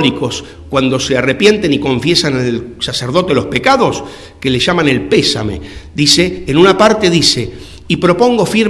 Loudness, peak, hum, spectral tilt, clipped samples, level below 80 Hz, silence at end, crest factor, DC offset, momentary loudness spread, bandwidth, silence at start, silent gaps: -12 LUFS; 0 dBFS; none; -4.5 dB/octave; 0.6%; -38 dBFS; 0 s; 12 dB; under 0.1%; 11 LU; 12 kHz; 0 s; none